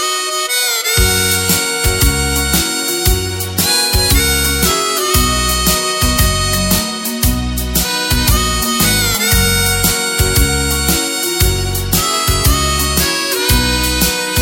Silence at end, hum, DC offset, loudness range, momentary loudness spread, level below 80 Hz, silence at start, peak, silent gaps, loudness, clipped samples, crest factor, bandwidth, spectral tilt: 0 s; none; under 0.1%; 1 LU; 4 LU; -20 dBFS; 0 s; 0 dBFS; none; -13 LUFS; under 0.1%; 14 dB; 17 kHz; -2.5 dB/octave